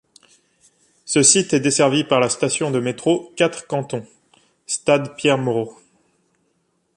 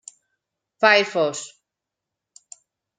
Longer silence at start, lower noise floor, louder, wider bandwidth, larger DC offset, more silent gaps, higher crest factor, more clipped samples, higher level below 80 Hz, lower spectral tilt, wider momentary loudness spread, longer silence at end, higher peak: first, 1.05 s vs 0.8 s; second, -67 dBFS vs -85 dBFS; about the same, -18 LUFS vs -19 LUFS; first, 11.5 kHz vs 9.6 kHz; neither; neither; about the same, 20 dB vs 24 dB; neither; first, -62 dBFS vs -78 dBFS; about the same, -3.5 dB/octave vs -2.5 dB/octave; second, 12 LU vs 18 LU; second, 1.25 s vs 1.5 s; about the same, 0 dBFS vs -2 dBFS